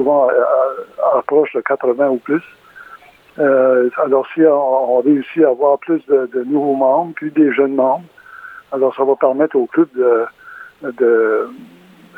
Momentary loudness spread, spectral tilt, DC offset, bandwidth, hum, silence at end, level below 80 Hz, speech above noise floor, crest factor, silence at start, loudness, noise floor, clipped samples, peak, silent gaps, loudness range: 8 LU; -8.5 dB/octave; under 0.1%; 4.1 kHz; none; 0.55 s; -70 dBFS; 27 dB; 14 dB; 0 s; -15 LUFS; -42 dBFS; under 0.1%; 0 dBFS; none; 3 LU